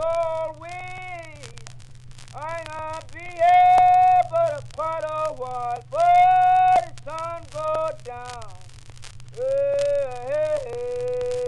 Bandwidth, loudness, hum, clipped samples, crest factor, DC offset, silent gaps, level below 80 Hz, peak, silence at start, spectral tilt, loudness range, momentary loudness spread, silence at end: 11 kHz; -21 LUFS; none; under 0.1%; 14 dB; under 0.1%; none; -48 dBFS; -8 dBFS; 0 s; -4.5 dB/octave; 9 LU; 21 LU; 0 s